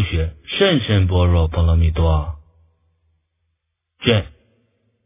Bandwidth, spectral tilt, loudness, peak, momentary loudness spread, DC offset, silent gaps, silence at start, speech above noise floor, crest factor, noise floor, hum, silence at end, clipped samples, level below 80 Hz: 3.8 kHz; -10.5 dB/octave; -18 LUFS; 0 dBFS; 9 LU; under 0.1%; none; 0 s; 59 dB; 18 dB; -74 dBFS; none; 0.8 s; under 0.1%; -24 dBFS